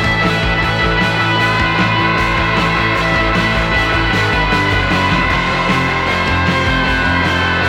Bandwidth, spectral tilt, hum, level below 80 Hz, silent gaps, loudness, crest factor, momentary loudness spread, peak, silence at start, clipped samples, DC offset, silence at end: 16.5 kHz; -5 dB/octave; none; -26 dBFS; none; -13 LUFS; 14 dB; 1 LU; 0 dBFS; 0 s; under 0.1%; under 0.1%; 0 s